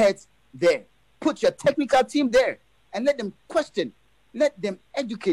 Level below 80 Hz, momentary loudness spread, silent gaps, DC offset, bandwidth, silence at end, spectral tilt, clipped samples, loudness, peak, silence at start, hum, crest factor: -58 dBFS; 12 LU; none; under 0.1%; 12.5 kHz; 0 s; -4.5 dB/octave; under 0.1%; -24 LUFS; -10 dBFS; 0 s; none; 14 dB